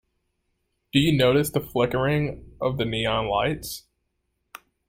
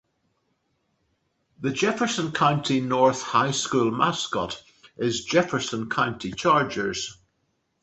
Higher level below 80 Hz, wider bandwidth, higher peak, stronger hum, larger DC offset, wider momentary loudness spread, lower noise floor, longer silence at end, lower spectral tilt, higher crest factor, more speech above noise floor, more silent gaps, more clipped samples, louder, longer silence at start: first, -48 dBFS vs -60 dBFS; first, 16.5 kHz vs 8.4 kHz; about the same, -6 dBFS vs -6 dBFS; neither; neither; first, 12 LU vs 8 LU; about the same, -75 dBFS vs -73 dBFS; first, 1.1 s vs 0.7 s; first, -5.5 dB/octave vs -4 dB/octave; about the same, 20 dB vs 20 dB; first, 53 dB vs 49 dB; neither; neither; about the same, -24 LUFS vs -24 LUFS; second, 0.95 s vs 1.6 s